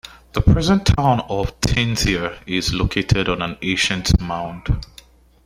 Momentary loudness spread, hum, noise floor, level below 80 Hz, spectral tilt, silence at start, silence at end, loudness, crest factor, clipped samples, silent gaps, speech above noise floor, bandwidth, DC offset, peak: 9 LU; none; -47 dBFS; -28 dBFS; -5 dB/octave; 0.05 s; 0.6 s; -19 LUFS; 18 dB; under 0.1%; none; 28 dB; 15.5 kHz; under 0.1%; -2 dBFS